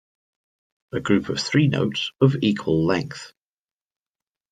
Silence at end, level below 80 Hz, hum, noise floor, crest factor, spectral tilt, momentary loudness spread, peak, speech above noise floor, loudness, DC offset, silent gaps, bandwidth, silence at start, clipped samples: 1.25 s; -58 dBFS; none; under -90 dBFS; 20 dB; -6 dB/octave; 12 LU; -4 dBFS; over 69 dB; -22 LUFS; under 0.1%; none; 9.4 kHz; 0.95 s; under 0.1%